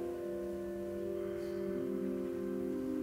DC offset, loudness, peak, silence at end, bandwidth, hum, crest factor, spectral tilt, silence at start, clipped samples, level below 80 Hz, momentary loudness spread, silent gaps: under 0.1%; -39 LUFS; -28 dBFS; 0 s; 16 kHz; none; 12 dB; -7.5 dB/octave; 0 s; under 0.1%; -62 dBFS; 3 LU; none